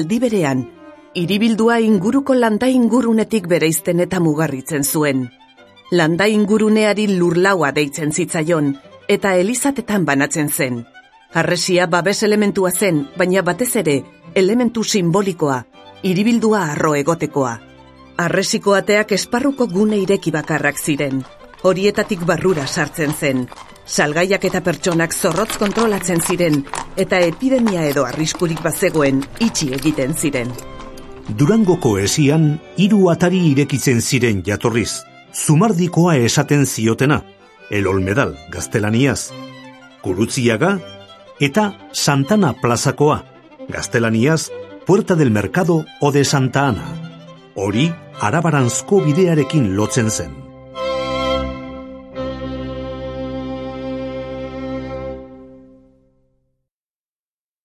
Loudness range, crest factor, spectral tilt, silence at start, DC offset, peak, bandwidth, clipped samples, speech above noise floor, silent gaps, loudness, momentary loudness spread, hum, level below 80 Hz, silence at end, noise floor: 4 LU; 16 dB; -5 dB/octave; 0 s; under 0.1%; 0 dBFS; 14.5 kHz; under 0.1%; over 74 dB; none; -17 LUFS; 13 LU; none; -44 dBFS; 2.1 s; under -90 dBFS